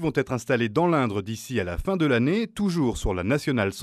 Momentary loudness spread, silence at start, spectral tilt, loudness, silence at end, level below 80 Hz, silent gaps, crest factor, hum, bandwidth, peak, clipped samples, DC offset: 6 LU; 0 s; -6 dB/octave; -25 LUFS; 0 s; -40 dBFS; none; 16 dB; none; 14.5 kHz; -8 dBFS; under 0.1%; under 0.1%